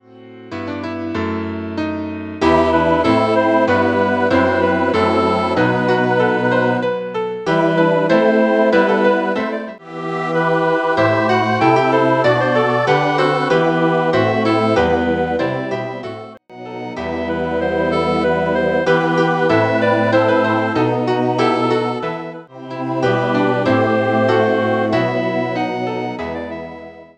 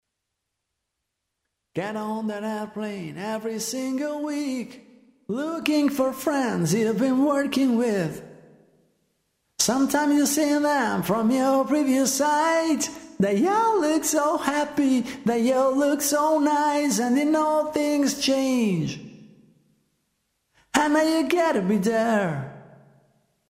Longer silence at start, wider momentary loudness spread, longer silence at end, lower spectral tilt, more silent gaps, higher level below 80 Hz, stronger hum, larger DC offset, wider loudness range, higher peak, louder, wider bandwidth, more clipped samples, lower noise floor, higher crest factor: second, 0.15 s vs 1.75 s; about the same, 11 LU vs 10 LU; second, 0.1 s vs 0.9 s; first, -7 dB/octave vs -4.5 dB/octave; neither; first, -46 dBFS vs -64 dBFS; neither; neither; second, 4 LU vs 8 LU; first, 0 dBFS vs -4 dBFS; first, -16 LUFS vs -23 LUFS; second, 9.4 kHz vs 16 kHz; neither; second, -38 dBFS vs -81 dBFS; about the same, 16 dB vs 20 dB